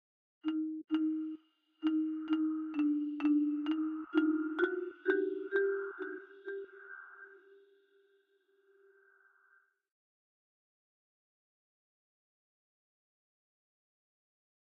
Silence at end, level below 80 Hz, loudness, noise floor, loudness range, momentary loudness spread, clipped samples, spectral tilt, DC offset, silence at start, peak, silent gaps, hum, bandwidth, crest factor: 7.4 s; -88 dBFS; -35 LUFS; -73 dBFS; 16 LU; 17 LU; under 0.1%; -2 dB/octave; under 0.1%; 0.45 s; -18 dBFS; none; none; 4.1 kHz; 20 dB